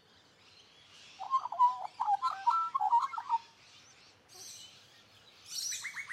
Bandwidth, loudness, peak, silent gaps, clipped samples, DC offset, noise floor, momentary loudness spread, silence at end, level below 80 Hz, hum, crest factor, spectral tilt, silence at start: 15.5 kHz; -32 LUFS; -18 dBFS; none; under 0.1%; under 0.1%; -63 dBFS; 23 LU; 0 s; -86 dBFS; none; 18 dB; 1 dB/octave; 0.95 s